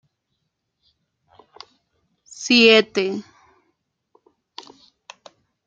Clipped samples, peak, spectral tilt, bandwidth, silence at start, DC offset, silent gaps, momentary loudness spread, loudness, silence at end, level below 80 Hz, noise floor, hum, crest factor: under 0.1%; -2 dBFS; -3 dB/octave; 7.8 kHz; 2.4 s; under 0.1%; none; 29 LU; -15 LUFS; 2.45 s; -74 dBFS; -76 dBFS; none; 22 dB